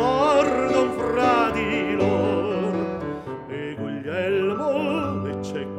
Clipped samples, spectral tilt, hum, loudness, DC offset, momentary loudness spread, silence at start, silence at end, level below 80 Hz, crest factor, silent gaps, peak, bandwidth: under 0.1%; -6 dB/octave; none; -23 LUFS; under 0.1%; 11 LU; 0 s; 0 s; -50 dBFS; 16 dB; none; -6 dBFS; 13.5 kHz